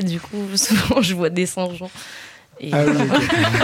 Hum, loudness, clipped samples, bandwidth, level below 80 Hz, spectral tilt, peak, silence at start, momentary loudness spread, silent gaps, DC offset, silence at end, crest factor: none; -19 LUFS; under 0.1%; 17 kHz; -48 dBFS; -4.5 dB/octave; -4 dBFS; 0 s; 18 LU; none; under 0.1%; 0 s; 14 dB